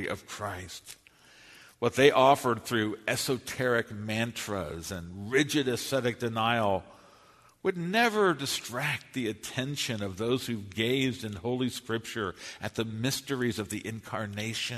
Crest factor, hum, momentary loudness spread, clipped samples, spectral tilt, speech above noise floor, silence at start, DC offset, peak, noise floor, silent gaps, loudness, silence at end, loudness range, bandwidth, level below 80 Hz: 24 dB; none; 12 LU; under 0.1%; -4.5 dB/octave; 29 dB; 0 s; under 0.1%; -6 dBFS; -59 dBFS; none; -30 LUFS; 0 s; 5 LU; 13.5 kHz; -62 dBFS